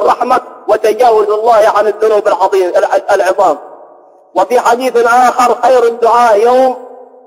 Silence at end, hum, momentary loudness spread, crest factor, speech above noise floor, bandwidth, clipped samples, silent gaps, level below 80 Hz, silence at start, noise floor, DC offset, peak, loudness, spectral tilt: 0.4 s; none; 6 LU; 10 dB; 32 dB; 16.5 kHz; under 0.1%; none; -54 dBFS; 0 s; -40 dBFS; under 0.1%; 0 dBFS; -10 LUFS; -3 dB/octave